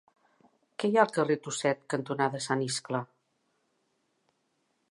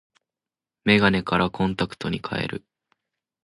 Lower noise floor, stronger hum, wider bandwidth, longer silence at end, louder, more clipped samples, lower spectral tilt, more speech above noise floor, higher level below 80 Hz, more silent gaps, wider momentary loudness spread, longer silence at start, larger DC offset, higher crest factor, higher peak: second, -76 dBFS vs under -90 dBFS; neither; about the same, 11.5 kHz vs 11.5 kHz; first, 1.85 s vs 0.85 s; second, -30 LUFS vs -23 LUFS; neither; second, -4.5 dB/octave vs -6.5 dB/octave; second, 47 dB vs over 67 dB; second, -82 dBFS vs -50 dBFS; neither; about the same, 10 LU vs 11 LU; about the same, 0.8 s vs 0.85 s; neither; about the same, 24 dB vs 22 dB; second, -8 dBFS vs -4 dBFS